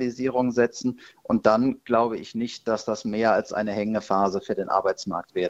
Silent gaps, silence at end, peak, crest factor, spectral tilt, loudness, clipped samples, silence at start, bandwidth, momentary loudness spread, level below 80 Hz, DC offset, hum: none; 0 s; -4 dBFS; 20 dB; -5.5 dB/octave; -25 LUFS; under 0.1%; 0 s; 8 kHz; 8 LU; -60 dBFS; under 0.1%; none